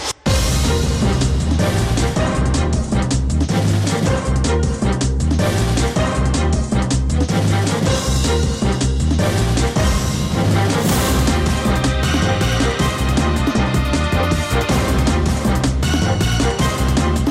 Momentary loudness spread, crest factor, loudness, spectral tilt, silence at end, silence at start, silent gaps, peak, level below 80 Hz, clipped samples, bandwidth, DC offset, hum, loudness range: 2 LU; 8 dB; -17 LUFS; -5 dB/octave; 0 s; 0 s; none; -8 dBFS; -22 dBFS; under 0.1%; 16 kHz; under 0.1%; none; 1 LU